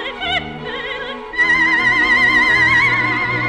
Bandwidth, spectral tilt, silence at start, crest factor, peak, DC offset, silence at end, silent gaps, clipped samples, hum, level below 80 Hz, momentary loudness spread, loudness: 12 kHz; -4 dB/octave; 0 s; 12 dB; -4 dBFS; under 0.1%; 0 s; none; under 0.1%; none; -42 dBFS; 14 LU; -13 LUFS